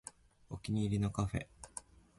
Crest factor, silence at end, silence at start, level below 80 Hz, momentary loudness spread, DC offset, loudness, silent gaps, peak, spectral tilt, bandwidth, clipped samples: 18 dB; 0.4 s; 0.05 s; -54 dBFS; 15 LU; under 0.1%; -38 LUFS; none; -22 dBFS; -6.5 dB/octave; 11.5 kHz; under 0.1%